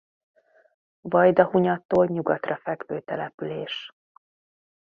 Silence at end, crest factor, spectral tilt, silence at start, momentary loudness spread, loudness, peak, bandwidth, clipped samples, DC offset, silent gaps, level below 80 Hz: 1 s; 24 dB; -8.5 dB/octave; 1.05 s; 15 LU; -24 LUFS; -2 dBFS; 6.4 kHz; under 0.1%; under 0.1%; 1.85-1.89 s, 3.34-3.38 s; -64 dBFS